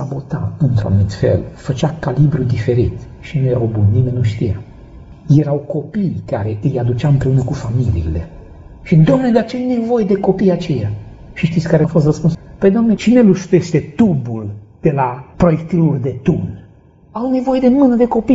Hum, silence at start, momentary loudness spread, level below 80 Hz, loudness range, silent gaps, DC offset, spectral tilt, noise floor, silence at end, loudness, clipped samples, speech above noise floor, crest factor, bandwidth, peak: none; 0 s; 11 LU; -36 dBFS; 3 LU; none; under 0.1%; -8.5 dB/octave; -44 dBFS; 0 s; -15 LUFS; under 0.1%; 31 dB; 14 dB; 7.8 kHz; 0 dBFS